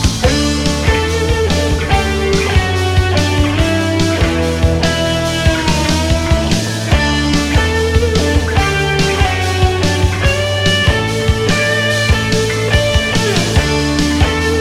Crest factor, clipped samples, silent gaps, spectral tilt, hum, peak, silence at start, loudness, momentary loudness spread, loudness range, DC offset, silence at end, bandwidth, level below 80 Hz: 12 dB; under 0.1%; none; -4.5 dB/octave; none; 0 dBFS; 0 s; -13 LUFS; 2 LU; 1 LU; under 0.1%; 0 s; 15.5 kHz; -20 dBFS